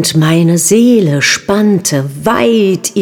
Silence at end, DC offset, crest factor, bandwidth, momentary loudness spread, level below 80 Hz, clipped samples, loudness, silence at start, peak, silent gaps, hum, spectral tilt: 0 s; 0.1%; 10 dB; 20 kHz; 5 LU; -48 dBFS; under 0.1%; -10 LUFS; 0 s; 0 dBFS; none; none; -4.5 dB/octave